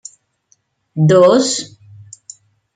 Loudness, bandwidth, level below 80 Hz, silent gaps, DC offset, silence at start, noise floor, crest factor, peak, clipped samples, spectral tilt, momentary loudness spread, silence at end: -12 LUFS; 9.4 kHz; -58 dBFS; none; under 0.1%; 0.95 s; -60 dBFS; 16 dB; -2 dBFS; under 0.1%; -5.5 dB/octave; 26 LU; 1.1 s